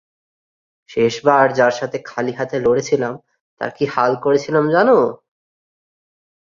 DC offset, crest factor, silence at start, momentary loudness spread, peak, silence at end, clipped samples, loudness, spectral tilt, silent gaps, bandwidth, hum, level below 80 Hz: under 0.1%; 18 dB; 0.9 s; 12 LU; -2 dBFS; 1.3 s; under 0.1%; -17 LUFS; -5.5 dB/octave; 3.41-3.57 s; 7.4 kHz; none; -58 dBFS